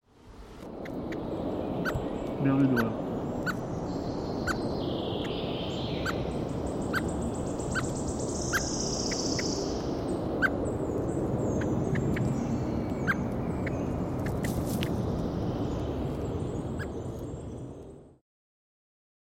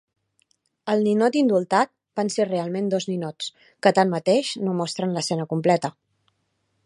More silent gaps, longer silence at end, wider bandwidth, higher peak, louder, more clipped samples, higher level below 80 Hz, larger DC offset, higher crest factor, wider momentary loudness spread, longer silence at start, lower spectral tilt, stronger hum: neither; first, 1.2 s vs 0.95 s; first, 16.5 kHz vs 11.5 kHz; second, -12 dBFS vs -2 dBFS; second, -31 LUFS vs -23 LUFS; neither; first, -44 dBFS vs -72 dBFS; neither; about the same, 18 dB vs 22 dB; about the same, 8 LU vs 9 LU; second, 0.25 s vs 0.85 s; about the same, -5.5 dB/octave vs -5.5 dB/octave; neither